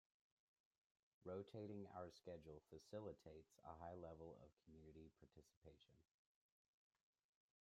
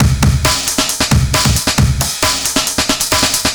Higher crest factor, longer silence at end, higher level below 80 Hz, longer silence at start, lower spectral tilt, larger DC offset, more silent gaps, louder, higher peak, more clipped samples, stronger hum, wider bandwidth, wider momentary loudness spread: first, 20 dB vs 14 dB; first, 1.6 s vs 0 s; second, -82 dBFS vs -22 dBFS; first, 1.2 s vs 0 s; first, -7 dB/octave vs -3 dB/octave; neither; first, 4.53-4.57 s, 5.56-5.62 s vs none; second, -59 LUFS vs -12 LUFS; second, -42 dBFS vs 0 dBFS; neither; neither; second, 11 kHz vs over 20 kHz; first, 11 LU vs 2 LU